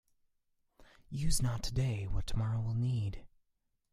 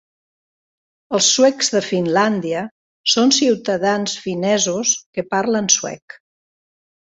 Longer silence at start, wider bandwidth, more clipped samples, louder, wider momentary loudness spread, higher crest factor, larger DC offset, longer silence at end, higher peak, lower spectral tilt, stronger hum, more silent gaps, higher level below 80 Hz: about the same, 1.1 s vs 1.1 s; first, 14.5 kHz vs 8.4 kHz; neither; second, -36 LUFS vs -17 LUFS; second, 7 LU vs 10 LU; about the same, 16 dB vs 18 dB; neither; second, 0.65 s vs 1.1 s; second, -18 dBFS vs 0 dBFS; first, -5 dB/octave vs -2.5 dB/octave; neither; second, none vs 2.71-3.04 s, 5.06-5.13 s; first, -44 dBFS vs -64 dBFS